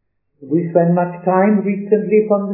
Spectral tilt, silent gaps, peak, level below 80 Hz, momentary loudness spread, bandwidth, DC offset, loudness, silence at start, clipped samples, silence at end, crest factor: -15.5 dB/octave; none; 0 dBFS; -74 dBFS; 4 LU; 2.9 kHz; under 0.1%; -16 LUFS; 0.4 s; under 0.1%; 0 s; 16 dB